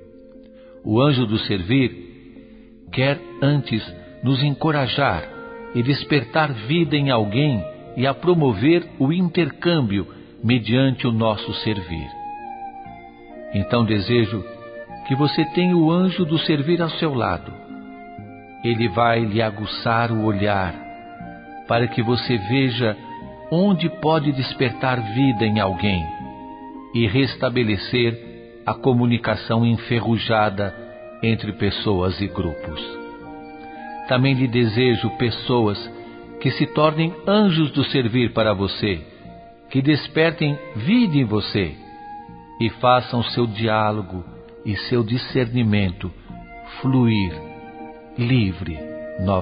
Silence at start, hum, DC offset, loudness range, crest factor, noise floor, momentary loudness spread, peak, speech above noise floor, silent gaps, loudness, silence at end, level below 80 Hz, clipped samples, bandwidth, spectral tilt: 0 s; none; under 0.1%; 3 LU; 20 dB; -44 dBFS; 19 LU; -2 dBFS; 24 dB; none; -20 LUFS; 0 s; -44 dBFS; under 0.1%; 5.2 kHz; -11.5 dB/octave